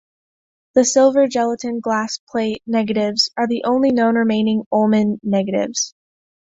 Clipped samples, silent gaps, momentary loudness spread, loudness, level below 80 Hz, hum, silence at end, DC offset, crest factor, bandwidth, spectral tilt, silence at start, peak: under 0.1%; 2.19-2.27 s, 4.66-4.71 s; 8 LU; -18 LUFS; -60 dBFS; none; 0.6 s; under 0.1%; 16 dB; 7.8 kHz; -4 dB/octave; 0.75 s; -2 dBFS